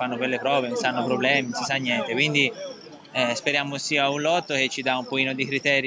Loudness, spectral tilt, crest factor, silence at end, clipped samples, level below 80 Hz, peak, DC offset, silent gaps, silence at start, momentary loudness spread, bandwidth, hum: -23 LUFS; -3.5 dB/octave; 18 dB; 0 s; under 0.1%; -72 dBFS; -6 dBFS; under 0.1%; none; 0 s; 5 LU; 8 kHz; none